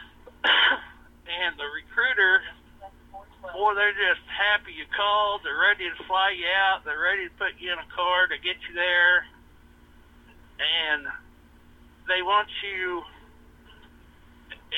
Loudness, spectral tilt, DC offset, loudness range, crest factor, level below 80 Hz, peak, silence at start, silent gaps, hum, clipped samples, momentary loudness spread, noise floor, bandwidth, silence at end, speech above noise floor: -24 LUFS; -3 dB/octave; under 0.1%; 5 LU; 20 dB; -56 dBFS; -6 dBFS; 0 s; none; none; under 0.1%; 12 LU; -53 dBFS; 9 kHz; 0 s; 28 dB